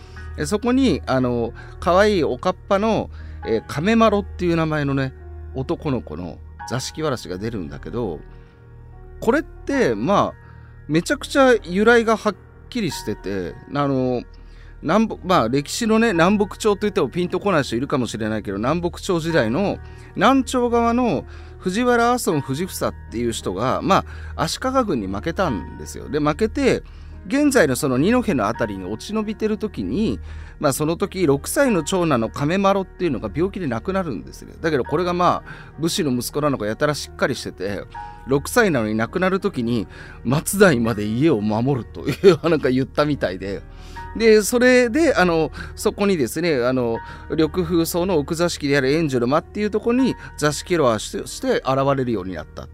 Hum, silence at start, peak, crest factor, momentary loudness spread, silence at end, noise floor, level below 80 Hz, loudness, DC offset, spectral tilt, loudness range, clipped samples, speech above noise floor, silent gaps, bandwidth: none; 0 s; -2 dBFS; 18 dB; 12 LU; 0 s; -43 dBFS; -40 dBFS; -20 LUFS; under 0.1%; -5.5 dB/octave; 5 LU; under 0.1%; 23 dB; none; 16 kHz